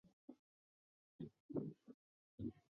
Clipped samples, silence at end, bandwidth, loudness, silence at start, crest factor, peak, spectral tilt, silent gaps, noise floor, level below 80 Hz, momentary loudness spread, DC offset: under 0.1%; 0.15 s; 6.4 kHz; -52 LUFS; 0.05 s; 22 dB; -32 dBFS; -11 dB/octave; 0.13-0.28 s, 0.39-1.19 s, 1.40-1.49 s, 1.94-2.38 s; under -90 dBFS; -76 dBFS; 19 LU; under 0.1%